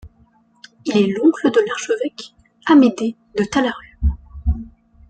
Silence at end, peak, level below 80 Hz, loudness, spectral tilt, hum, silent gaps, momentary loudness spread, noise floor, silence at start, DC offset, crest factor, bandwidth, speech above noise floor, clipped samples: 0.45 s; -2 dBFS; -30 dBFS; -18 LUFS; -6 dB/octave; none; none; 15 LU; -55 dBFS; 0.05 s; under 0.1%; 16 dB; 9.2 kHz; 39 dB; under 0.1%